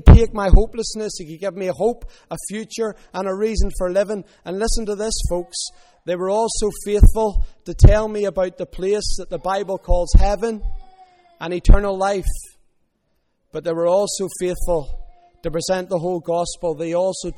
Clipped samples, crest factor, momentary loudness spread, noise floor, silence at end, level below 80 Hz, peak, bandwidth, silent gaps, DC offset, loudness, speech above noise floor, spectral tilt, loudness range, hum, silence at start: 0.3%; 18 dB; 13 LU; -67 dBFS; 0 s; -20 dBFS; 0 dBFS; 13 kHz; none; under 0.1%; -21 LUFS; 49 dB; -6 dB/octave; 5 LU; none; 0.05 s